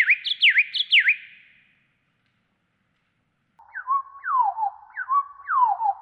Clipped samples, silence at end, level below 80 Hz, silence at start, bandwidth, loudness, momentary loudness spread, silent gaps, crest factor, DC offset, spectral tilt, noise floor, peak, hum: under 0.1%; 0.05 s; -80 dBFS; 0 s; 9.2 kHz; -21 LUFS; 13 LU; none; 18 dB; under 0.1%; 2 dB/octave; -71 dBFS; -8 dBFS; none